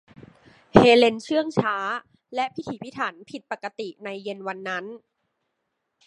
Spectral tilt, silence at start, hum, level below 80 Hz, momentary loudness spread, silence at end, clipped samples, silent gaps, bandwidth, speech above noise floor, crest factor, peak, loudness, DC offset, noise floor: -5.5 dB/octave; 0.75 s; none; -52 dBFS; 18 LU; 1.1 s; under 0.1%; none; 11 kHz; 55 dB; 24 dB; 0 dBFS; -23 LUFS; under 0.1%; -78 dBFS